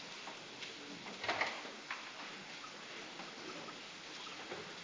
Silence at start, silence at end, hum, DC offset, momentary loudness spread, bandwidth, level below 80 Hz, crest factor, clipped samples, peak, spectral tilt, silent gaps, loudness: 0 s; 0 s; none; under 0.1%; 9 LU; 7.8 kHz; -82 dBFS; 24 dB; under 0.1%; -22 dBFS; -2 dB/octave; none; -44 LUFS